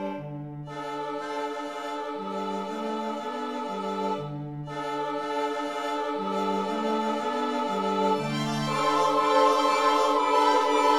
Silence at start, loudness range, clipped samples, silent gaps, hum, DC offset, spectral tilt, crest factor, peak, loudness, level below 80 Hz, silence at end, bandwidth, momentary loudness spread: 0 s; 9 LU; under 0.1%; none; none; 0.1%; -4.5 dB/octave; 18 dB; -10 dBFS; -27 LUFS; -68 dBFS; 0 s; 16 kHz; 12 LU